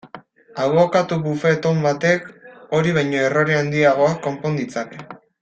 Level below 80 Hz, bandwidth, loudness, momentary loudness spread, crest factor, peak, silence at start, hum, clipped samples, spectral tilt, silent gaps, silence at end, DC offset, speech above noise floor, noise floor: -58 dBFS; 8.6 kHz; -19 LUFS; 12 LU; 16 dB; -2 dBFS; 0.05 s; none; under 0.1%; -6 dB/octave; none; 0.25 s; under 0.1%; 24 dB; -42 dBFS